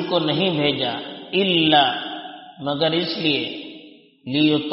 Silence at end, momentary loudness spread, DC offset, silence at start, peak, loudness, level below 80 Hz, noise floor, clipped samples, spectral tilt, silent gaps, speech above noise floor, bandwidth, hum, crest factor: 0 s; 18 LU; under 0.1%; 0 s; -2 dBFS; -20 LUFS; -64 dBFS; -45 dBFS; under 0.1%; -2.5 dB/octave; none; 25 dB; 5.8 kHz; none; 18 dB